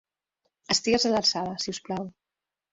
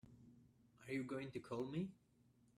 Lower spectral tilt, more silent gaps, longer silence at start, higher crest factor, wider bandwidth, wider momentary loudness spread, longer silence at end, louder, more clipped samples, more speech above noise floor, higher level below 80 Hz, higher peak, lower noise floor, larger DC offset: second, -3 dB/octave vs -7 dB/octave; neither; first, 0.7 s vs 0.05 s; about the same, 18 dB vs 16 dB; second, 8 kHz vs 14 kHz; second, 12 LU vs 20 LU; about the same, 0.6 s vs 0.65 s; first, -26 LUFS vs -47 LUFS; neither; first, 62 dB vs 28 dB; first, -62 dBFS vs -80 dBFS; first, -10 dBFS vs -32 dBFS; first, -89 dBFS vs -74 dBFS; neither